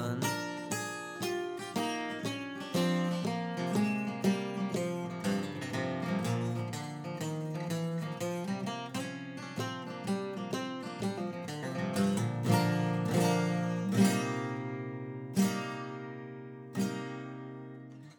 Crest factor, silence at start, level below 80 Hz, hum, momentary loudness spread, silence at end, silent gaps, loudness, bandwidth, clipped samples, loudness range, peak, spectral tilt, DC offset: 20 dB; 0 s; -76 dBFS; none; 11 LU; 0.05 s; none; -34 LUFS; over 20 kHz; under 0.1%; 7 LU; -14 dBFS; -5.5 dB/octave; under 0.1%